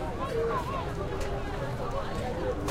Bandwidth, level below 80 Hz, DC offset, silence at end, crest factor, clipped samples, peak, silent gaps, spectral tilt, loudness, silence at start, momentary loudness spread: 16 kHz; -38 dBFS; under 0.1%; 0 s; 14 dB; under 0.1%; -18 dBFS; none; -6 dB/octave; -33 LUFS; 0 s; 4 LU